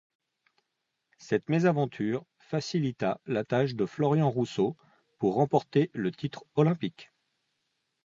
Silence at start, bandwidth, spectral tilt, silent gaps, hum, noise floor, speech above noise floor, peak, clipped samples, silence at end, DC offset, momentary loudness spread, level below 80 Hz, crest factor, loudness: 1.2 s; 7.6 kHz; -7.5 dB/octave; none; none; -82 dBFS; 54 dB; -10 dBFS; under 0.1%; 1 s; under 0.1%; 8 LU; -68 dBFS; 20 dB; -29 LUFS